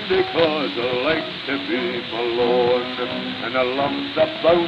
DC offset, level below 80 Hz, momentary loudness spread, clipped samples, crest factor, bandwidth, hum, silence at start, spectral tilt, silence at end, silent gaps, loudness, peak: under 0.1%; -56 dBFS; 7 LU; under 0.1%; 16 dB; 7.6 kHz; none; 0 s; -6.5 dB/octave; 0 s; none; -21 LUFS; -4 dBFS